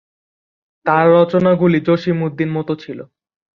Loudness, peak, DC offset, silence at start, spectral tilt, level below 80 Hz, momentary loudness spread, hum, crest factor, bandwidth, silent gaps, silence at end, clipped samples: -15 LUFS; -2 dBFS; under 0.1%; 0.85 s; -9 dB/octave; -56 dBFS; 13 LU; none; 16 dB; 6.4 kHz; none; 0.55 s; under 0.1%